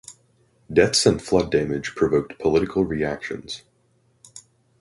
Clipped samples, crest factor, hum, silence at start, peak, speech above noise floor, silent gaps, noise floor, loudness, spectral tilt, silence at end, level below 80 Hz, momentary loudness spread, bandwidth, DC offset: under 0.1%; 20 dB; none; 0.1 s; -2 dBFS; 42 dB; none; -63 dBFS; -22 LUFS; -4.5 dB/octave; 0.4 s; -46 dBFS; 13 LU; 11.5 kHz; under 0.1%